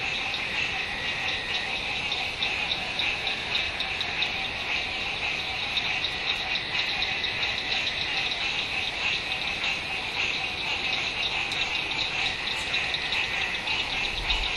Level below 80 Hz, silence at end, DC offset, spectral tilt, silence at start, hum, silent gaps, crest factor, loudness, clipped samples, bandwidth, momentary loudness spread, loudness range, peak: -46 dBFS; 0 s; under 0.1%; -1.5 dB/octave; 0 s; none; none; 18 dB; -26 LUFS; under 0.1%; 12.5 kHz; 2 LU; 1 LU; -12 dBFS